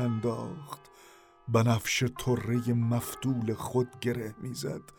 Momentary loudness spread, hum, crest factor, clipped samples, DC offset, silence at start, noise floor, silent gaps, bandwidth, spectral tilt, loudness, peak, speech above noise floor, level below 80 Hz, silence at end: 13 LU; none; 18 dB; under 0.1%; under 0.1%; 0 s; -56 dBFS; none; 19.5 kHz; -5.5 dB/octave; -30 LUFS; -14 dBFS; 26 dB; -58 dBFS; 0.15 s